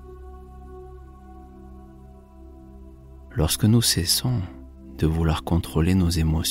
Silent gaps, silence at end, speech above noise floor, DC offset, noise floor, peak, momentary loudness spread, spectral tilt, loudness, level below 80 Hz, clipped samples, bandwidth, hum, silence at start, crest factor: none; 0 s; 24 dB; under 0.1%; -45 dBFS; -6 dBFS; 25 LU; -5 dB/octave; -22 LUFS; -36 dBFS; under 0.1%; 16 kHz; none; 0 s; 18 dB